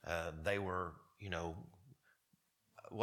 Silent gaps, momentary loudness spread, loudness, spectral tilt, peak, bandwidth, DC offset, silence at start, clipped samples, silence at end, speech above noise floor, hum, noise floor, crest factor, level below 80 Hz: none; 16 LU; -43 LUFS; -5.5 dB/octave; -22 dBFS; 18.5 kHz; under 0.1%; 0.05 s; under 0.1%; 0 s; 37 dB; none; -79 dBFS; 24 dB; -62 dBFS